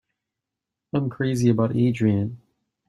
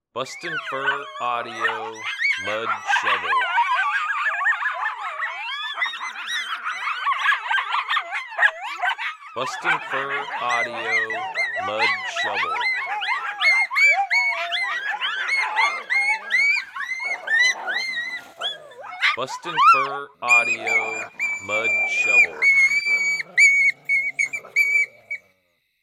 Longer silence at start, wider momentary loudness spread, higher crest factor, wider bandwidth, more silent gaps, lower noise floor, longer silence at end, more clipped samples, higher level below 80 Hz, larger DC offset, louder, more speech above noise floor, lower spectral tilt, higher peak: first, 0.95 s vs 0.15 s; second, 7 LU vs 12 LU; about the same, 16 dB vs 18 dB; second, 12.5 kHz vs 15.5 kHz; neither; first, -85 dBFS vs -68 dBFS; second, 0.5 s vs 0.65 s; neither; first, -58 dBFS vs -76 dBFS; neither; second, -23 LUFS vs -20 LUFS; first, 64 dB vs 46 dB; first, -8 dB/octave vs -0.5 dB/octave; second, -8 dBFS vs -4 dBFS